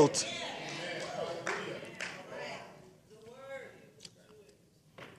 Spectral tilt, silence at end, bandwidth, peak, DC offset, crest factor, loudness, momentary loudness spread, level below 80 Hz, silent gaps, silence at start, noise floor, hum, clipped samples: -3 dB/octave; 0 s; 14.5 kHz; -12 dBFS; under 0.1%; 26 dB; -38 LUFS; 21 LU; -76 dBFS; none; 0 s; -63 dBFS; none; under 0.1%